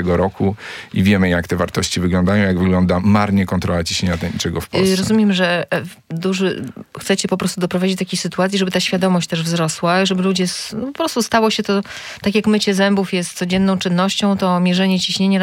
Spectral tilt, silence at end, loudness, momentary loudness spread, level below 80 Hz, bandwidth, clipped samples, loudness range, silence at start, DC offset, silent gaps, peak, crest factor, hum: -5 dB/octave; 0 s; -17 LUFS; 6 LU; -48 dBFS; 16 kHz; under 0.1%; 2 LU; 0 s; under 0.1%; none; -2 dBFS; 16 dB; none